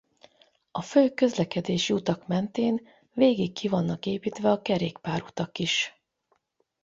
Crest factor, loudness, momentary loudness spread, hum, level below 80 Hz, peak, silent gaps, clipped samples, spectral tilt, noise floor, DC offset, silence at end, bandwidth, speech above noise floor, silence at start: 20 dB; -27 LUFS; 10 LU; none; -64 dBFS; -8 dBFS; none; under 0.1%; -5.5 dB/octave; -73 dBFS; under 0.1%; 0.95 s; 7.8 kHz; 47 dB; 0.75 s